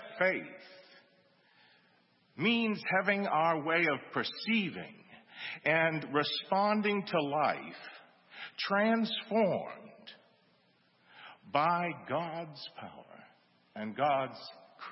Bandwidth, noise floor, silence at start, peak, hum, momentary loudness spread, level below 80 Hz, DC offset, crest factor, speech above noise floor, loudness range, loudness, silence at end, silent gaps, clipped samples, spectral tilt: 5.8 kHz; -69 dBFS; 0 s; -12 dBFS; none; 21 LU; -84 dBFS; under 0.1%; 22 dB; 37 dB; 6 LU; -32 LUFS; 0 s; none; under 0.1%; -3 dB/octave